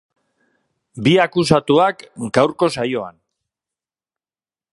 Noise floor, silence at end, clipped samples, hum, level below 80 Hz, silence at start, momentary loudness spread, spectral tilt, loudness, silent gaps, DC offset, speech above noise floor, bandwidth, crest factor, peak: under -90 dBFS; 1.65 s; under 0.1%; none; -54 dBFS; 0.95 s; 11 LU; -5.5 dB/octave; -17 LUFS; none; under 0.1%; over 74 dB; 11.5 kHz; 20 dB; 0 dBFS